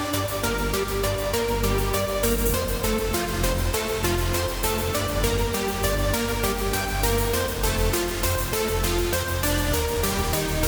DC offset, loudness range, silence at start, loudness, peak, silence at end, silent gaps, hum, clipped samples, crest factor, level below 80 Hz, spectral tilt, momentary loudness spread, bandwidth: under 0.1%; 0 LU; 0 s; -24 LUFS; -8 dBFS; 0 s; none; none; under 0.1%; 16 dB; -30 dBFS; -4 dB/octave; 2 LU; over 20 kHz